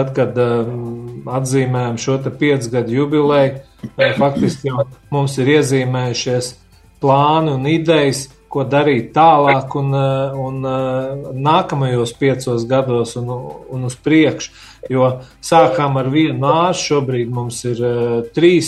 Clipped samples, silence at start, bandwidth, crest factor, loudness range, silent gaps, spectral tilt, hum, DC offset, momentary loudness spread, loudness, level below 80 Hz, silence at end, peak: under 0.1%; 0 s; 12.5 kHz; 16 dB; 3 LU; none; -6 dB/octave; none; under 0.1%; 12 LU; -16 LUFS; -50 dBFS; 0 s; 0 dBFS